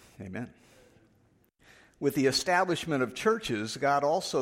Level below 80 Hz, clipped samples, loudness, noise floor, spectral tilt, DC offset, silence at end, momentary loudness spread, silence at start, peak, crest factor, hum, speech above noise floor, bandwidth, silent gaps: -64 dBFS; under 0.1%; -28 LUFS; -66 dBFS; -4 dB/octave; under 0.1%; 0 s; 14 LU; 0.2 s; -14 dBFS; 18 dB; none; 38 dB; 16 kHz; none